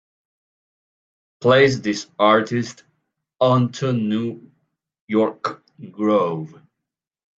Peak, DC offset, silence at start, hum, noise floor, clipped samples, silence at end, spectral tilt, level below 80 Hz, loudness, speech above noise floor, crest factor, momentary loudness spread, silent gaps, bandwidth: -2 dBFS; under 0.1%; 1.4 s; none; -84 dBFS; under 0.1%; 0.9 s; -6 dB/octave; -64 dBFS; -20 LUFS; 65 dB; 20 dB; 16 LU; 5.01-5.08 s; 7.8 kHz